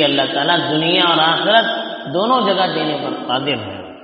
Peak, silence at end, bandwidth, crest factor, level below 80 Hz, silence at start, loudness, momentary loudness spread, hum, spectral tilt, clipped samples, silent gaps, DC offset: 0 dBFS; 0 s; 5.8 kHz; 16 dB; -62 dBFS; 0 s; -16 LUFS; 10 LU; none; -1.5 dB/octave; under 0.1%; none; under 0.1%